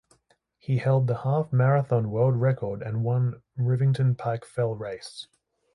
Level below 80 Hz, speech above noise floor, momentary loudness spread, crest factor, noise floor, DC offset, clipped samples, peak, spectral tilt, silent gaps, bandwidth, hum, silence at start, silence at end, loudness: -60 dBFS; 43 dB; 13 LU; 14 dB; -67 dBFS; under 0.1%; under 0.1%; -10 dBFS; -8.5 dB/octave; none; 11 kHz; none; 0.7 s; 0.5 s; -25 LUFS